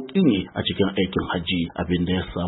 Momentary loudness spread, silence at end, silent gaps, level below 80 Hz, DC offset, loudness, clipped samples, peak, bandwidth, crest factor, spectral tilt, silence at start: 5 LU; 0 s; none; -44 dBFS; under 0.1%; -23 LUFS; under 0.1%; -6 dBFS; 4.1 kHz; 16 dB; -11 dB/octave; 0 s